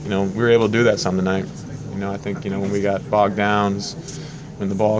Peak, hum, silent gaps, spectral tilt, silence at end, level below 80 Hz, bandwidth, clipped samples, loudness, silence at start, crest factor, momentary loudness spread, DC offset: -4 dBFS; none; none; -6 dB/octave; 0 s; -46 dBFS; 8 kHz; under 0.1%; -20 LUFS; 0 s; 16 dB; 15 LU; under 0.1%